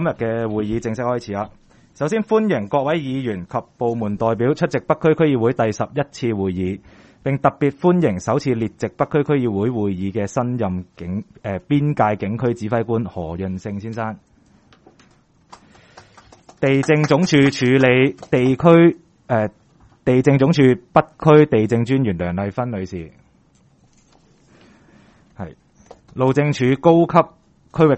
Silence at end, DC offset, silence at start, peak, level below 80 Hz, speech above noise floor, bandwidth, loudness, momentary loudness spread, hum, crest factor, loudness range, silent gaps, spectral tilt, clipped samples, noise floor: 0 s; under 0.1%; 0 s; 0 dBFS; -50 dBFS; 38 dB; 8.4 kHz; -19 LUFS; 14 LU; none; 18 dB; 11 LU; none; -7.5 dB/octave; under 0.1%; -55 dBFS